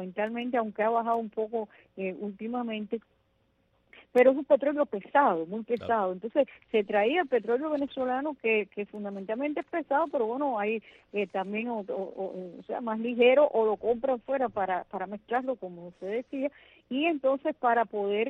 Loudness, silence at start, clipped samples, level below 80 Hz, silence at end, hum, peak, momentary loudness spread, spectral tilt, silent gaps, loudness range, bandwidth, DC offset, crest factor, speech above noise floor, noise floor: -29 LUFS; 0 s; under 0.1%; -72 dBFS; 0 s; none; -10 dBFS; 13 LU; -7.5 dB/octave; none; 5 LU; 5 kHz; under 0.1%; 20 dB; 42 dB; -71 dBFS